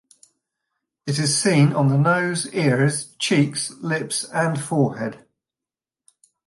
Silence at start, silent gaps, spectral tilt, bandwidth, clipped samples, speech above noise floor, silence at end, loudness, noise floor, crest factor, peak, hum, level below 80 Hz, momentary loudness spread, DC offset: 1.05 s; none; -5 dB/octave; 11.5 kHz; under 0.1%; 69 dB; 1.3 s; -21 LUFS; -90 dBFS; 16 dB; -6 dBFS; none; -66 dBFS; 9 LU; under 0.1%